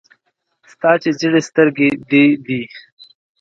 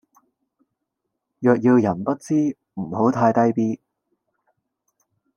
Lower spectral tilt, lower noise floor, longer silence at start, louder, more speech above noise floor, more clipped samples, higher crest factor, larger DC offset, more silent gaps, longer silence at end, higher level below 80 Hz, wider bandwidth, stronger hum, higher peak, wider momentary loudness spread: second, -6 dB/octave vs -8.5 dB/octave; second, -67 dBFS vs -79 dBFS; second, 0.85 s vs 1.4 s; first, -15 LUFS vs -20 LUFS; second, 53 dB vs 61 dB; neither; about the same, 16 dB vs 18 dB; neither; neither; second, 0.6 s vs 1.6 s; first, -62 dBFS vs -68 dBFS; second, 7.8 kHz vs 10 kHz; neither; first, 0 dBFS vs -4 dBFS; about the same, 11 LU vs 11 LU